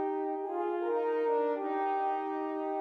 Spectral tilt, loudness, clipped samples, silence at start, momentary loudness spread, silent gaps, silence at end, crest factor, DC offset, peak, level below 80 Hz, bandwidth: -5 dB/octave; -32 LUFS; under 0.1%; 0 s; 5 LU; none; 0 s; 12 dB; under 0.1%; -20 dBFS; under -90 dBFS; 5.2 kHz